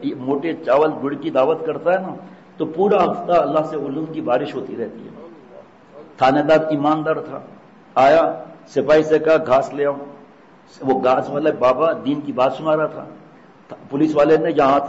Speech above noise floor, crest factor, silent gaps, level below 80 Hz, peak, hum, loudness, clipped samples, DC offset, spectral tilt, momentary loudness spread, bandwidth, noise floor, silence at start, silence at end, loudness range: 28 dB; 14 dB; none; -58 dBFS; -6 dBFS; none; -18 LUFS; under 0.1%; under 0.1%; -7 dB/octave; 14 LU; 8 kHz; -46 dBFS; 0 s; 0 s; 3 LU